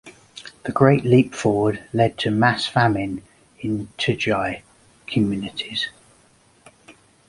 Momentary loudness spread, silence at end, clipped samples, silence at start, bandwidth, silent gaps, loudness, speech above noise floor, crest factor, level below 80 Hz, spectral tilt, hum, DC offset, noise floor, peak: 17 LU; 0.4 s; under 0.1%; 0.05 s; 11.5 kHz; none; -21 LUFS; 36 dB; 20 dB; -52 dBFS; -6 dB/octave; none; under 0.1%; -56 dBFS; -2 dBFS